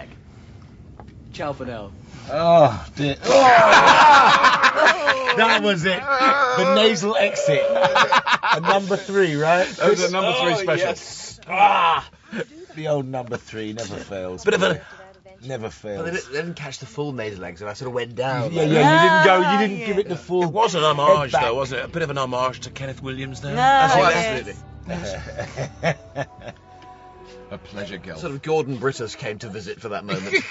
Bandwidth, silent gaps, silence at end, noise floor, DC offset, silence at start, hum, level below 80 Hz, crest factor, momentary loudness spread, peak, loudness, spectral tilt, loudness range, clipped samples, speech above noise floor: 8 kHz; none; 0 s; -43 dBFS; under 0.1%; 0 s; none; -50 dBFS; 18 dB; 19 LU; -2 dBFS; -18 LUFS; -4 dB/octave; 15 LU; under 0.1%; 24 dB